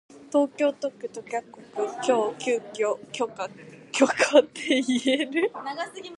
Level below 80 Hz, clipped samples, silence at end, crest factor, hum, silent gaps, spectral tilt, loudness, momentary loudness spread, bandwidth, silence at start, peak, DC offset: -74 dBFS; under 0.1%; 0 s; 22 dB; none; none; -3 dB/octave; -25 LUFS; 13 LU; 11.5 kHz; 0.15 s; -4 dBFS; under 0.1%